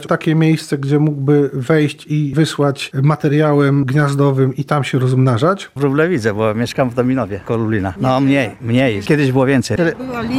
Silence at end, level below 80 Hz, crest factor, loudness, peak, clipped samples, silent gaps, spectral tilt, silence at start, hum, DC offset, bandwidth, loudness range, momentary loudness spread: 0 s; -48 dBFS; 12 dB; -15 LUFS; -2 dBFS; under 0.1%; none; -7 dB/octave; 0 s; none; under 0.1%; 14 kHz; 2 LU; 5 LU